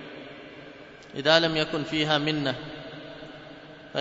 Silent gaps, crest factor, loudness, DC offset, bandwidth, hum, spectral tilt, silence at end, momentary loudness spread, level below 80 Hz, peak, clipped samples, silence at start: none; 24 dB; -25 LUFS; under 0.1%; 8 kHz; none; -4.5 dB/octave; 0 s; 24 LU; -58 dBFS; -4 dBFS; under 0.1%; 0 s